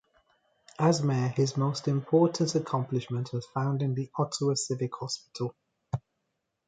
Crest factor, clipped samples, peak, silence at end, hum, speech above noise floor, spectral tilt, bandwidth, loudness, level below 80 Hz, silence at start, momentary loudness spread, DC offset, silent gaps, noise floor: 18 dB; under 0.1%; -10 dBFS; 0.7 s; none; 53 dB; -6 dB/octave; 9.4 kHz; -29 LUFS; -66 dBFS; 0.8 s; 12 LU; under 0.1%; none; -81 dBFS